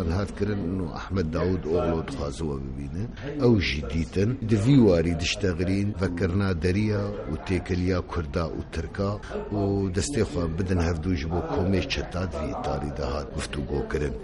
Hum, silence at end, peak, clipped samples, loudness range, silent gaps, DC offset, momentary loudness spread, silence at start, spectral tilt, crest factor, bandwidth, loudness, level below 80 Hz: none; 0 s; -8 dBFS; under 0.1%; 5 LU; none; under 0.1%; 9 LU; 0 s; -6.5 dB/octave; 18 dB; 11.5 kHz; -27 LUFS; -38 dBFS